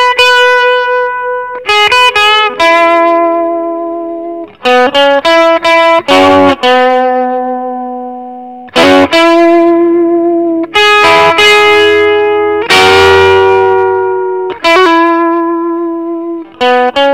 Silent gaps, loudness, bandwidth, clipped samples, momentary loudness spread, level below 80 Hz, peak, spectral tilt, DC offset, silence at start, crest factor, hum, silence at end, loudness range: none; -7 LUFS; 16 kHz; 2%; 12 LU; -44 dBFS; 0 dBFS; -3.5 dB/octave; 0.5%; 0 s; 8 dB; none; 0 s; 3 LU